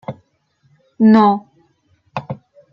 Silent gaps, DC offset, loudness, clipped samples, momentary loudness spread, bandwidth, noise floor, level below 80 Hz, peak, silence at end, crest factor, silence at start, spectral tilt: none; under 0.1%; -13 LUFS; under 0.1%; 22 LU; 5.6 kHz; -61 dBFS; -64 dBFS; -2 dBFS; 0.4 s; 16 dB; 0.1 s; -9 dB/octave